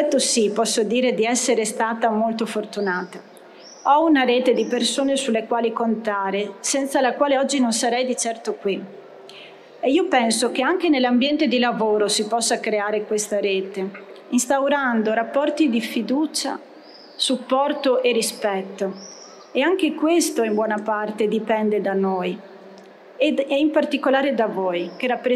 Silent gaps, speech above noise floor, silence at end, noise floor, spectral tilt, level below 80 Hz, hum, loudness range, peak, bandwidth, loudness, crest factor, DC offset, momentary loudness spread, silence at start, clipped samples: none; 24 dB; 0 s; -44 dBFS; -3 dB/octave; -70 dBFS; none; 3 LU; -4 dBFS; 14 kHz; -21 LUFS; 16 dB; under 0.1%; 9 LU; 0 s; under 0.1%